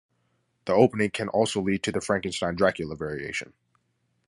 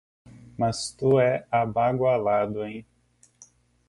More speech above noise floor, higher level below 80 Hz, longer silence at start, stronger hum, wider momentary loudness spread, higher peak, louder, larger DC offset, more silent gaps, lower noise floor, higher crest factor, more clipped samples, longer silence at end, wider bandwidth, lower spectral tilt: first, 47 dB vs 34 dB; about the same, -56 dBFS vs -58 dBFS; first, 0.65 s vs 0.35 s; second, none vs 60 Hz at -50 dBFS; second, 11 LU vs 14 LU; first, -6 dBFS vs -10 dBFS; about the same, -26 LUFS vs -24 LUFS; neither; neither; first, -73 dBFS vs -58 dBFS; first, 22 dB vs 16 dB; neither; second, 0.85 s vs 1.05 s; about the same, 11.5 kHz vs 11.5 kHz; about the same, -5 dB/octave vs -6 dB/octave